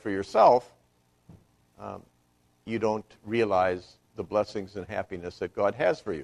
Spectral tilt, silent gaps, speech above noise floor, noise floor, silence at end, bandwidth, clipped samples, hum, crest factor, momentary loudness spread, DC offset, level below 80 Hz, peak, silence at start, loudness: -6 dB/octave; none; 40 dB; -67 dBFS; 0 s; 11 kHz; under 0.1%; 60 Hz at -60 dBFS; 22 dB; 21 LU; under 0.1%; -62 dBFS; -8 dBFS; 0.05 s; -27 LUFS